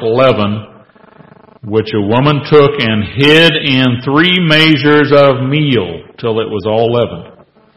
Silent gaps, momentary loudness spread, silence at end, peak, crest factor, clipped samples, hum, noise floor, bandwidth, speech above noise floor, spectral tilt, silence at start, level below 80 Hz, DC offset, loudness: none; 10 LU; 0.45 s; 0 dBFS; 12 dB; 0.4%; none; -41 dBFS; 12.5 kHz; 31 dB; -6.5 dB/octave; 0 s; -42 dBFS; under 0.1%; -10 LUFS